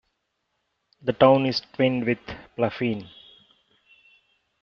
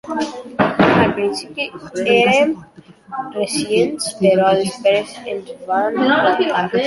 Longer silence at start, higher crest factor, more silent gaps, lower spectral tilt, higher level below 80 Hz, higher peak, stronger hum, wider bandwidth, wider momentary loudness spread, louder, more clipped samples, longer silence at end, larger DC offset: first, 1.05 s vs 0.05 s; first, 24 dB vs 16 dB; neither; about the same, -4.5 dB/octave vs -4.5 dB/octave; second, -60 dBFS vs -52 dBFS; about the same, -2 dBFS vs -2 dBFS; neither; second, 6.6 kHz vs 11.5 kHz; about the same, 15 LU vs 13 LU; second, -23 LUFS vs -17 LUFS; neither; first, 1.55 s vs 0 s; neither